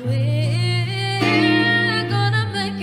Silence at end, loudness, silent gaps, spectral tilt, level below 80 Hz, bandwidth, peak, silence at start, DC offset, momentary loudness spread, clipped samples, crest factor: 0 s; -18 LUFS; none; -6 dB/octave; -54 dBFS; 11 kHz; -4 dBFS; 0 s; under 0.1%; 6 LU; under 0.1%; 14 dB